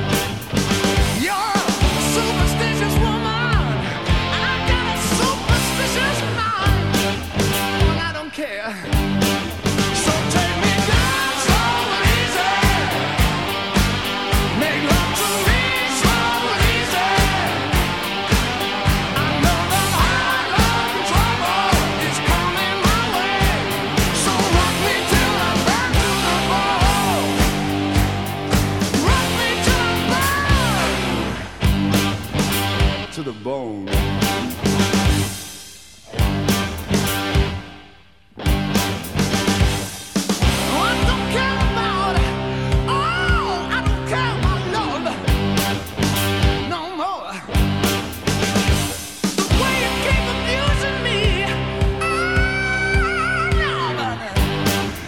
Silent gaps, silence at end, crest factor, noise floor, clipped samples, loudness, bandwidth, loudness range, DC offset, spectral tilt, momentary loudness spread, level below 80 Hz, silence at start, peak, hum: none; 0 s; 18 dB; -49 dBFS; under 0.1%; -19 LUFS; 19 kHz; 3 LU; 0.4%; -4 dB/octave; 6 LU; -26 dBFS; 0 s; -2 dBFS; none